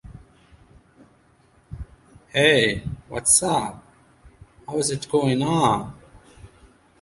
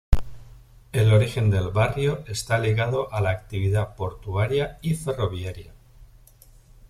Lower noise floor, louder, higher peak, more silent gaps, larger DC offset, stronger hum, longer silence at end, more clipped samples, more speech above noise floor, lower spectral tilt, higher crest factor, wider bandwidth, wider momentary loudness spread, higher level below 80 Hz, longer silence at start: first, -58 dBFS vs -51 dBFS; first, -21 LUFS vs -24 LUFS; about the same, -2 dBFS vs -2 dBFS; neither; neither; neither; first, 0.55 s vs 0.05 s; neither; first, 37 dB vs 28 dB; second, -3 dB/octave vs -6.5 dB/octave; about the same, 22 dB vs 22 dB; second, 11.5 kHz vs 14 kHz; first, 23 LU vs 11 LU; second, -48 dBFS vs -34 dBFS; about the same, 0.05 s vs 0.1 s